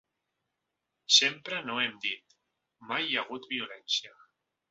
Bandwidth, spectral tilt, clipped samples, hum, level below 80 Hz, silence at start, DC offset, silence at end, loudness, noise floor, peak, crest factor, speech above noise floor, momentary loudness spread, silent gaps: 8 kHz; 1.5 dB/octave; under 0.1%; none; -82 dBFS; 1.1 s; under 0.1%; 0.6 s; -28 LUFS; -84 dBFS; -8 dBFS; 24 dB; 53 dB; 14 LU; none